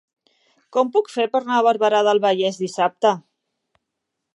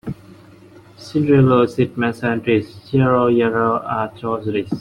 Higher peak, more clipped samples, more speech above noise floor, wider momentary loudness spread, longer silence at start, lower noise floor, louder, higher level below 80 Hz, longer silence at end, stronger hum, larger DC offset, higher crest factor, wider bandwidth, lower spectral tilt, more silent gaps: about the same, -4 dBFS vs -4 dBFS; neither; first, 61 dB vs 27 dB; second, 6 LU vs 10 LU; first, 0.75 s vs 0.05 s; first, -80 dBFS vs -44 dBFS; about the same, -19 LUFS vs -18 LUFS; second, -80 dBFS vs -48 dBFS; first, 1.15 s vs 0 s; neither; neither; about the same, 18 dB vs 14 dB; about the same, 11 kHz vs 11 kHz; second, -4.5 dB/octave vs -8.5 dB/octave; neither